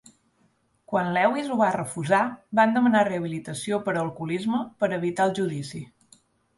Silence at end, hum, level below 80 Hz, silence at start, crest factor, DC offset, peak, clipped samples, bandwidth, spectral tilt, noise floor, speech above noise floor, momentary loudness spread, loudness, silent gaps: 0.75 s; none; -66 dBFS; 0.9 s; 20 dB; under 0.1%; -6 dBFS; under 0.1%; 11.5 kHz; -6 dB/octave; -67 dBFS; 42 dB; 11 LU; -25 LUFS; none